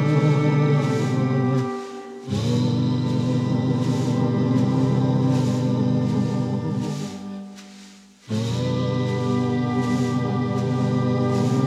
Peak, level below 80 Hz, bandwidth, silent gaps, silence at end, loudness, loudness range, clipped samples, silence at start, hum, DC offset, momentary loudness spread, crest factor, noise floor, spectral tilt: -8 dBFS; -60 dBFS; 10.5 kHz; none; 0 s; -22 LUFS; 5 LU; under 0.1%; 0 s; none; under 0.1%; 10 LU; 12 dB; -46 dBFS; -7.5 dB/octave